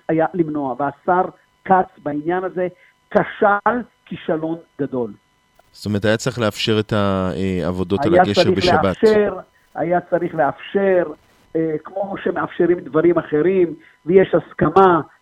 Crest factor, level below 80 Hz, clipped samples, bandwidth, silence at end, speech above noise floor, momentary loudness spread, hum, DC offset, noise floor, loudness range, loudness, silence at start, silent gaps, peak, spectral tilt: 18 dB; -50 dBFS; under 0.1%; 13 kHz; 0.15 s; 39 dB; 12 LU; none; under 0.1%; -57 dBFS; 5 LU; -18 LUFS; 0.1 s; none; 0 dBFS; -6.5 dB/octave